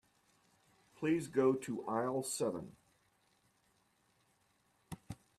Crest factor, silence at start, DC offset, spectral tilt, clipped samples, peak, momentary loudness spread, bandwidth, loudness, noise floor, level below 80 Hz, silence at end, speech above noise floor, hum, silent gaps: 20 dB; 1 s; under 0.1%; -5.5 dB/octave; under 0.1%; -20 dBFS; 20 LU; 13.5 kHz; -37 LUFS; -75 dBFS; -74 dBFS; 0.25 s; 40 dB; none; none